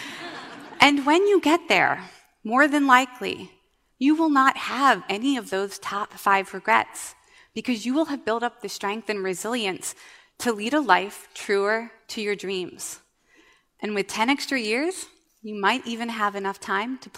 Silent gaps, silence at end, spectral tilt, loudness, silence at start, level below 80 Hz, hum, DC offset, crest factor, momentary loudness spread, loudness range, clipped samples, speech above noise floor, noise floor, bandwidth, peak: none; 0 s; -3 dB/octave; -23 LUFS; 0 s; -70 dBFS; none; under 0.1%; 24 dB; 17 LU; 7 LU; under 0.1%; 35 dB; -59 dBFS; 16 kHz; 0 dBFS